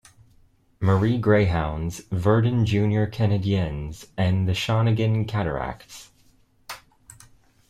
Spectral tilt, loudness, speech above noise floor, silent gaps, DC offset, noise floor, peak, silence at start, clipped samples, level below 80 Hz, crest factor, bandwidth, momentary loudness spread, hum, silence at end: -7 dB/octave; -23 LUFS; 37 dB; none; under 0.1%; -59 dBFS; -6 dBFS; 0.8 s; under 0.1%; -44 dBFS; 18 dB; 14 kHz; 20 LU; none; 0.95 s